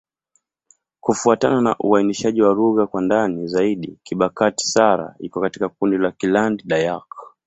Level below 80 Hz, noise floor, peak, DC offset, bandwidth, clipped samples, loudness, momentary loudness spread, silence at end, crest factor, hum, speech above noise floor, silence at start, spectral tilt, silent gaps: -58 dBFS; -68 dBFS; -2 dBFS; under 0.1%; 8.4 kHz; under 0.1%; -19 LUFS; 8 LU; 0.2 s; 18 dB; none; 49 dB; 1.05 s; -5 dB/octave; none